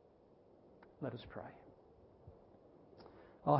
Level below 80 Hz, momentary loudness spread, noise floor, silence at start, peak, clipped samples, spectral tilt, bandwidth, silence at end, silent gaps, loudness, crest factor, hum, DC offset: -72 dBFS; 19 LU; -66 dBFS; 1 s; -18 dBFS; under 0.1%; -7.5 dB/octave; 5.6 kHz; 0 s; none; -51 LUFS; 26 dB; none; under 0.1%